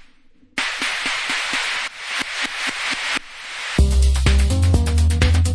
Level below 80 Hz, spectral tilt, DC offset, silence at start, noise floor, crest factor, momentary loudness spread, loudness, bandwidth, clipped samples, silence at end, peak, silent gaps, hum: -22 dBFS; -4 dB/octave; under 0.1%; 0.6 s; -50 dBFS; 16 dB; 7 LU; -20 LUFS; 11 kHz; under 0.1%; 0 s; -2 dBFS; none; none